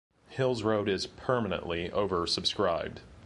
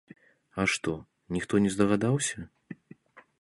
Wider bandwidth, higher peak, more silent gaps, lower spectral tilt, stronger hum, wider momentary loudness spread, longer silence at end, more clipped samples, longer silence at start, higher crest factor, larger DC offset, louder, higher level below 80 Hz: about the same, 11.5 kHz vs 11.5 kHz; about the same, -12 dBFS vs -10 dBFS; neither; about the same, -5 dB/octave vs -5 dB/octave; neither; second, 5 LU vs 21 LU; second, 0 s vs 0.2 s; neither; second, 0.3 s vs 0.55 s; about the same, 20 dB vs 20 dB; neither; about the same, -30 LUFS vs -28 LUFS; about the same, -54 dBFS vs -56 dBFS